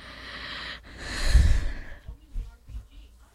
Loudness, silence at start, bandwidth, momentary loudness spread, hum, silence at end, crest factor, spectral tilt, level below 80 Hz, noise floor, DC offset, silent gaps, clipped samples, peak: -29 LUFS; 0 s; 12.5 kHz; 22 LU; none; 0.3 s; 20 dB; -4.5 dB/octave; -28 dBFS; -50 dBFS; under 0.1%; none; under 0.1%; -6 dBFS